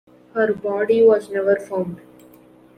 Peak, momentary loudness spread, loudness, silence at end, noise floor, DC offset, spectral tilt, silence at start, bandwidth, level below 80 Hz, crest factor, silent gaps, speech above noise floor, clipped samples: -4 dBFS; 15 LU; -19 LUFS; 0.8 s; -49 dBFS; under 0.1%; -7 dB/octave; 0.35 s; 10 kHz; -64 dBFS; 16 dB; none; 30 dB; under 0.1%